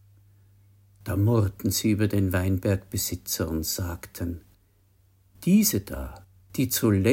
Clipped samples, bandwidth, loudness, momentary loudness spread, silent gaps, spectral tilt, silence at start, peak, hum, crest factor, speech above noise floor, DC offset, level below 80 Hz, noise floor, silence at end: under 0.1%; 16.5 kHz; -26 LUFS; 14 LU; none; -5.5 dB/octave; 1.05 s; -8 dBFS; none; 18 dB; 38 dB; under 0.1%; -48 dBFS; -62 dBFS; 0 s